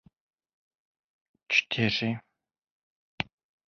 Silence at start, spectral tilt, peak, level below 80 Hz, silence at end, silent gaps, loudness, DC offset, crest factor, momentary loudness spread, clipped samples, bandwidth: 1.5 s; -4.5 dB/octave; -8 dBFS; -64 dBFS; 0.45 s; 2.71-3.18 s; -28 LUFS; under 0.1%; 26 dB; 12 LU; under 0.1%; 7.2 kHz